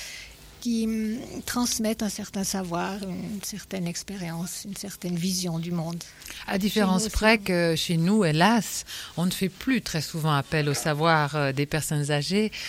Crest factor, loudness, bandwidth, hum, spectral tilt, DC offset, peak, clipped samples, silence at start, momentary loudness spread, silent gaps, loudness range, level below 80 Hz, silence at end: 20 dB; -26 LUFS; 16.5 kHz; none; -4.5 dB/octave; under 0.1%; -6 dBFS; under 0.1%; 0 s; 12 LU; none; 7 LU; -48 dBFS; 0 s